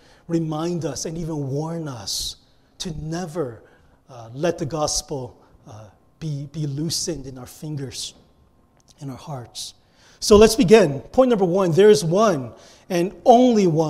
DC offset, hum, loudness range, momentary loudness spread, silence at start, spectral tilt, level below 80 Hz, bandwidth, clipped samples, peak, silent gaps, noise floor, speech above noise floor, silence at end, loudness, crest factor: under 0.1%; none; 13 LU; 19 LU; 0.3 s; -5 dB/octave; -44 dBFS; 15.5 kHz; under 0.1%; 0 dBFS; none; -57 dBFS; 37 dB; 0 s; -20 LUFS; 20 dB